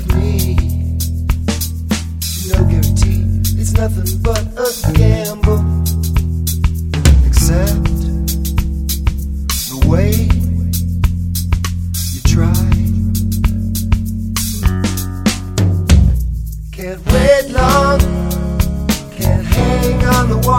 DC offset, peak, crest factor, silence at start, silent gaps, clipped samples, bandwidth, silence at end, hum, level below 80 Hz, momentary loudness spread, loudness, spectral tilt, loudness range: under 0.1%; 0 dBFS; 14 dB; 0 s; none; under 0.1%; 19 kHz; 0 s; none; -18 dBFS; 7 LU; -15 LUFS; -5.5 dB/octave; 2 LU